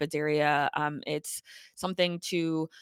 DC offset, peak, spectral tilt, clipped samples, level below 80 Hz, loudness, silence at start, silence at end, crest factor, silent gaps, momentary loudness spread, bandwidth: under 0.1%; -12 dBFS; -4.5 dB/octave; under 0.1%; -72 dBFS; -30 LUFS; 0 s; 0 s; 18 dB; none; 12 LU; 19 kHz